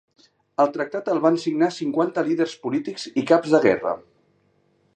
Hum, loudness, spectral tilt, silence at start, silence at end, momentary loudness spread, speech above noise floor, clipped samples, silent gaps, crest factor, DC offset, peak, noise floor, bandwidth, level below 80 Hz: none; -22 LUFS; -6 dB/octave; 0.6 s; 0.95 s; 9 LU; 43 dB; under 0.1%; none; 20 dB; under 0.1%; -4 dBFS; -64 dBFS; 9.2 kHz; -68 dBFS